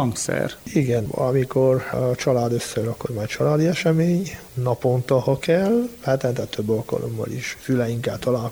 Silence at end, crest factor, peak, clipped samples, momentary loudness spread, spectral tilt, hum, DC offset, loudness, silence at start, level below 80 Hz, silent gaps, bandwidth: 0 s; 16 dB; -6 dBFS; under 0.1%; 8 LU; -6 dB/octave; none; under 0.1%; -22 LUFS; 0 s; -50 dBFS; none; over 20 kHz